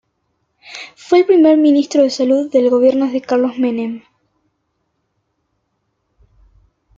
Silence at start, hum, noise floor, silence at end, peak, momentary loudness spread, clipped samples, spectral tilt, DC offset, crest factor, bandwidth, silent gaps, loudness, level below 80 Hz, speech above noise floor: 0.7 s; none; -69 dBFS; 3 s; -2 dBFS; 22 LU; under 0.1%; -4.5 dB/octave; under 0.1%; 16 dB; 7.8 kHz; none; -13 LUFS; -60 dBFS; 56 dB